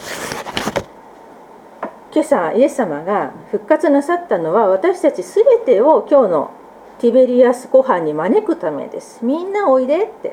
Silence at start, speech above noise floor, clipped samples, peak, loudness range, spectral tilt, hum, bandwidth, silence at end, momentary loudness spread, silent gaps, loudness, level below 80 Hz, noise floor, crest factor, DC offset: 0 s; 25 dB; under 0.1%; 0 dBFS; 6 LU; -5.5 dB/octave; none; 16.5 kHz; 0 s; 13 LU; none; -15 LUFS; -56 dBFS; -40 dBFS; 16 dB; under 0.1%